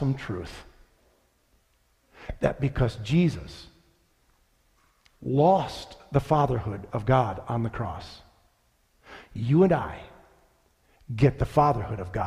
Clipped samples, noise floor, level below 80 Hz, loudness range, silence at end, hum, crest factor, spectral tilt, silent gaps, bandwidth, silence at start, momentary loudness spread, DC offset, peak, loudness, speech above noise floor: under 0.1%; -67 dBFS; -46 dBFS; 4 LU; 0 s; none; 20 dB; -8 dB/octave; none; 12 kHz; 0 s; 21 LU; under 0.1%; -8 dBFS; -26 LUFS; 42 dB